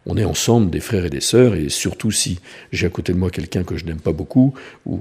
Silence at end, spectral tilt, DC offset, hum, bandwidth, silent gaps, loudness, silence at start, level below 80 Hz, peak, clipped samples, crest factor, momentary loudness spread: 0 s; -5 dB/octave; under 0.1%; none; 15.5 kHz; none; -19 LUFS; 0.05 s; -38 dBFS; 0 dBFS; under 0.1%; 18 dB; 10 LU